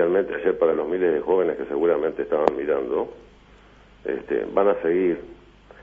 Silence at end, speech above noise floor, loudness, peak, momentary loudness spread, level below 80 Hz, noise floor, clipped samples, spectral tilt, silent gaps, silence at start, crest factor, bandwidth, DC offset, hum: 0 s; 28 dB; -23 LUFS; 0 dBFS; 8 LU; -54 dBFS; -51 dBFS; under 0.1%; -8 dB/octave; none; 0 s; 24 dB; 4.9 kHz; under 0.1%; 50 Hz at -55 dBFS